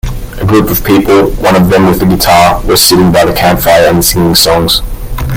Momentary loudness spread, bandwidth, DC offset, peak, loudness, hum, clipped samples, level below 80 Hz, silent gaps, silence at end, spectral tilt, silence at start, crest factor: 5 LU; over 20 kHz; under 0.1%; 0 dBFS; -7 LUFS; none; 1%; -20 dBFS; none; 0 s; -4.5 dB/octave; 0.05 s; 6 dB